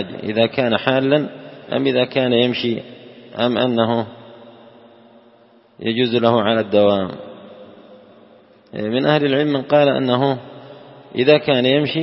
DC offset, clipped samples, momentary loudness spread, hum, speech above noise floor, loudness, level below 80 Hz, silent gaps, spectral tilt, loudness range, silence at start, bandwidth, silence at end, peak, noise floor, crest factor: under 0.1%; under 0.1%; 17 LU; none; 34 dB; -18 LUFS; -62 dBFS; none; -10 dB/octave; 4 LU; 0 s; 5.8 kHz; 0 s; 0 dBFS; -51 dBFS; 18 dB